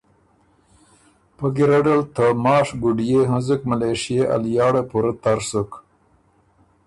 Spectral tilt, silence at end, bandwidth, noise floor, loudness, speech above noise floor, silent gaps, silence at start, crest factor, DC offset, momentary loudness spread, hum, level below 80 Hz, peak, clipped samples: -6.5 dB/octave; 1.05 s; 11.5 kHz; -59 dBFS; -19 LUFS; 40 dB; none; 1.4 s; 16 dB; under 0.1%; 7 LU; none; -52 dBFS; -6 dBFS; under 0.1%